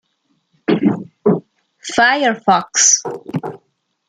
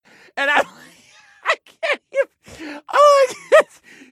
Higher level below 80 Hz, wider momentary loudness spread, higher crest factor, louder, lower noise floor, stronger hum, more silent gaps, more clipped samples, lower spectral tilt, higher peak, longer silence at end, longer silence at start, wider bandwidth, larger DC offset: about the same, -62 dBFS vs -66 dBFS; second, 15 LU vs 19 LU; about the same, 16 dB vs 20 dB; about the same, -15 LUFS vs -17 LUFS; first, -65 dBFS vs -50 dBFS; neither; neither; neither; about the same, -2.5 dB/octave vs -1.5 dB/octave; about the same, 0 dBFS vs 0 dBFS; about the same, 0.5 s vs 0.5 s; first, 0.7 s vs 0.35 s; second, 11 kHz vs 14 kHz; neither